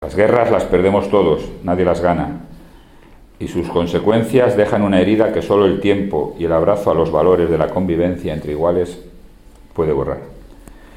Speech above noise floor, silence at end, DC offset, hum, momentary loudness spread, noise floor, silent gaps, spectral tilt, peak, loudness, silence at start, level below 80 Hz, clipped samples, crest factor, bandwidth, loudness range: 28 dB; 0.2 s; under 0.1%; none; 10 LU; -43 dBFS; none; -7.5 dB/octave; 0 dBFS; -16 LUFS; 0 s; -38 dBFS; under 0.1%; 16 dB; 15.5 kHz; 4 LU